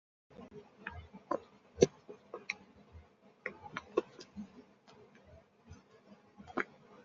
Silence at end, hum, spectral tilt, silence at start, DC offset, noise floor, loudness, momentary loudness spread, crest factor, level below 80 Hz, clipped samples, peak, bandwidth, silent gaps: 0.05 s; none; -4.5 dB/octave; 0.4 s; under 0.1%; -62 dBFS; -40 LUFS; 27 LU; 34 dB; -68 dBFS; under 0.1%; -8 dBFS; 7.4 kHz; none